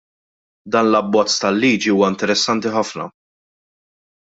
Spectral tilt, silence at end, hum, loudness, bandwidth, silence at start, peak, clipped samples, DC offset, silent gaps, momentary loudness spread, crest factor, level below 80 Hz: -4 dB/octave; 1.1 s; none; -17 LUFS; 8 kHz; 0.65 s; -2 dBFS; under 0.1%; under 0.1%; none; 8 LU; 18 dB; -60 dBFS